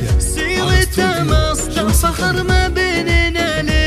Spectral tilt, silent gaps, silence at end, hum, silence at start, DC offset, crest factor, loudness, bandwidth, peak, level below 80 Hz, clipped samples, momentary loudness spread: -4.5 dB/octave; none; 0 s; none; 0 s; under 0.1%; 14 dB; -15 LUFS; 15.5 kHz; 0 dBFS; -20 dBFS; under 0.1%; 3 LU